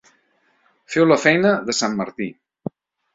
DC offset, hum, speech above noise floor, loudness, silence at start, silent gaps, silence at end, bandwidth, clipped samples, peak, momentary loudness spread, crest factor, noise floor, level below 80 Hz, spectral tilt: under 0.1%; none; 45 dB; -18 LUFS; 0.9 s; none; 0.85 s; 7.8 kHz; under 0.1%; 0 dBFS; 20 LU; 20 dB; -63 dBFS; -62 dBFS; -4.5 dB/octave